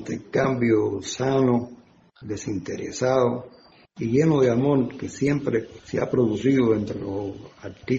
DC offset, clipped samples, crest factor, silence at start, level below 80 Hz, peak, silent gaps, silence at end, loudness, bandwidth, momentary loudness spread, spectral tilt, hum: under 0.1%; under 0.1%; 16 dB; 0 s; -56 dBFS; -8 dBFS; none; 0 s; -23 LUFS; 8 kHz; 14 LU; -7 dB/octave; none